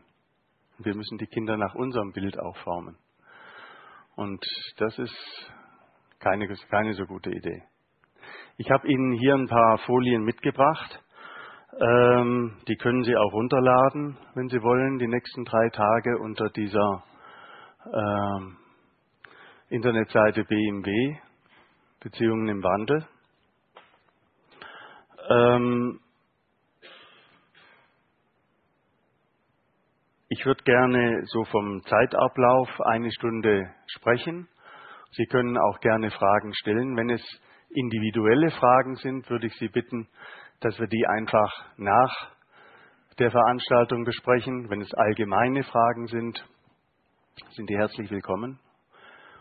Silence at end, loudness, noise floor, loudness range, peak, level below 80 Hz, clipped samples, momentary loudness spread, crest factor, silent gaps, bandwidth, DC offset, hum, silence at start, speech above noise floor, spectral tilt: 0.85 s; -25 LUFS; -71 dBFS; 9 LU; -4 dBFS; -58 dBFS; under 0.1%; 18 LU; 22 dB; none; 4.8 kHz; under 0.1%; none; 0.8 s; 47 dB; -10.5 dB/octave